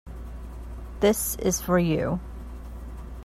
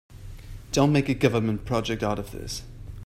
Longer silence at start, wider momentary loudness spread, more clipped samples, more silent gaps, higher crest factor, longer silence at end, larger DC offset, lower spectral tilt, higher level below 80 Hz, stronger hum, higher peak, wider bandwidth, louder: about the same, 0.05 s vs 0.1 s; second, 18 LU vs 22 LU; neither; neither; about the same, 18 dB vs 22 dB; about the same, 0 s vs 0 s; neither; about the same, -5 dB/octave vs -6 dB/octave; about the same, -38 dBFS vs -42 dBFS; neither; second, -10 dBFS vs -4 dBFS; about the same, 16 kHz vs 15.5 kHz; about the same, -25 LUFS vs -25 LUFS